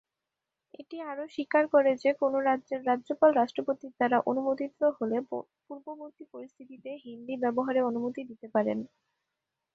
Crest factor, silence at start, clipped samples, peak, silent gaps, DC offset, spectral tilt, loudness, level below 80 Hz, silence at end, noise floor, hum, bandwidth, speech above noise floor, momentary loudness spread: 20 dB; 0.8 s; under 0.1%; -10 dBFS; none; under 0.1%; -7 dB/octave; -29 LUFS; -78 dBFS; 0.9 s; -88 dBFS; none; 7.8 kHz; 59 dB; 21 LU